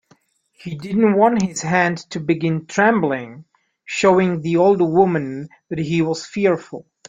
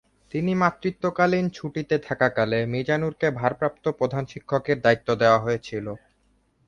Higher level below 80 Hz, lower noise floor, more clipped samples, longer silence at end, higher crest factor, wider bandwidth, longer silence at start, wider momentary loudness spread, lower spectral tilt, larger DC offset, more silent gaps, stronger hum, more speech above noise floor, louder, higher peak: about the same, -58 dBFS vs -56 dBFS; second, -58 dBFS vs -65 dBFS; neither; second, 0.25 s vs 0.7 s; about the same, 18 dB vs 20 dB; about the same, 9.4 kHz vs 9.6 kHz; first, 0.65 s vs 0.35 s; first, 14 LU vs 11 LU; about the same, -6 dB/octave vs -7 dB/octave; neither; neither; neither; about the same, 40 dB vs 42 dB; first, -18 LUFS vs -24 LUFS; about the same, -2 dBFS vs -4 dBFS